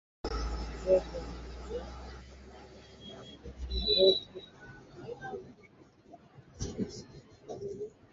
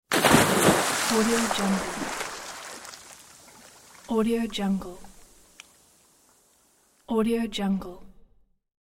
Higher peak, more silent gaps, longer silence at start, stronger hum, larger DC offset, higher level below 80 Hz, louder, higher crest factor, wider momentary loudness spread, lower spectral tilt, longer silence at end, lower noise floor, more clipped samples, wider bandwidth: second, -12 dBFS vs -4 dBFS; neither; first, 0.25 s vs 0.1 s; neither; neither; first, -46 dBFS vs -52 dBFS; second, -33 LUFS vs -24 LUFS; about the same, 24 dB vs 24 dB; first, 25 LU vs 22 LU; about the same, -3.5 dB/octave vs -3.5 dB/octave; second, 0.05 s vs 0.75 s; second, -59 dBFS vs -63 dBFS; neither; second, 7.6 kHz vs 16.5 kHz